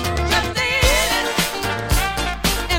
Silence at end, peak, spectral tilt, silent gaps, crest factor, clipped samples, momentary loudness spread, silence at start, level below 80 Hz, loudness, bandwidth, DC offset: 0 s; -4 dBFS; -3 dB/octave; none; 16 dB; under 0.1%; 5 LU; 0 s; -26 dBFS; -18 LUFS; 17 kHz; under 0.1%